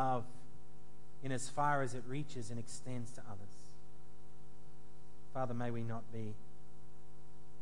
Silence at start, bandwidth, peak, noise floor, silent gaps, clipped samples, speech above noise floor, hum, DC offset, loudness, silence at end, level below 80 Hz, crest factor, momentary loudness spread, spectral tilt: 0 s; 11.5 kHz; -22 dBFS; -61 dBFS; none; under 0.1%; 20 dB; none; 2%; -42 LUFS; 0 s; -70 dBFS; 22 dB; 25 LU; -5.5 dB/octave